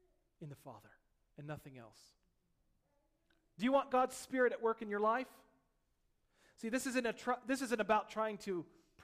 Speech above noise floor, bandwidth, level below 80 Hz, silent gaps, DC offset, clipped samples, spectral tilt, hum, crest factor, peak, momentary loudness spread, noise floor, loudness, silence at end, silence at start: 41 dB; 15.5 kHz; -74 dBFS; none; under 0.1%; under 0.1%; -4.5 dB/octave; none; 20 dB; -20 dBFS; 21 LU; -79 dBFS; -37 LUFS; 0.4 s; 0.4 s